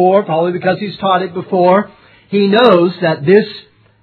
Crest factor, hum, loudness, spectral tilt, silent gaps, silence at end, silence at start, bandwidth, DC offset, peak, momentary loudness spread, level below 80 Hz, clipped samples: 12 dB; none; -13 LUFS; -9 dB/octave; none; 0.4 s; 0 s; 5.4 kHz; under 0.1%; 0 dBFS; 9 LU; -60 dBFS; 0.1%